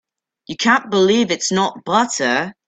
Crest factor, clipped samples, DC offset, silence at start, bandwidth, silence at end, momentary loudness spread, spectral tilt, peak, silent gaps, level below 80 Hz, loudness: 18 dB; under 0.1%; under 0.1%; 0.5 s; 9.2 kHz; 0.15 s; 5 LU; -3.5 dB/octave; 0 dBFS; none; -60 dBFS; -17 LUFS